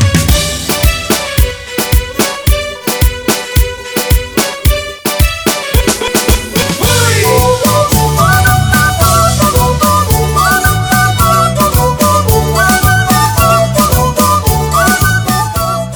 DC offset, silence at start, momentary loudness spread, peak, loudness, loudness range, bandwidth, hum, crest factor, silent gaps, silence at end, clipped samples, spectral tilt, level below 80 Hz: under 0.1%; 0 s; 5 LU; 0 dBFS; -10 LUFS; 4 LU; over 20 kHz; none; 10 dB; none; 0 s; under 0.1%; -4 dB/octave; -18 dBFS